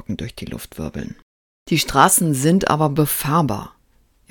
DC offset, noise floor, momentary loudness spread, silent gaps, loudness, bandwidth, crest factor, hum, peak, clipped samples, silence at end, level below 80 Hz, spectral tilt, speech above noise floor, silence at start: under 0.1%; -58 dBFS; 18 LU; 1.23-1.66 s; -17 LUFS; 19 kHz; 20 dB; none; 0 dBFS; under 0.1%; 0.6 s; -44 dBFS; -4.5 dB/octave; 39 dB; 0.1 s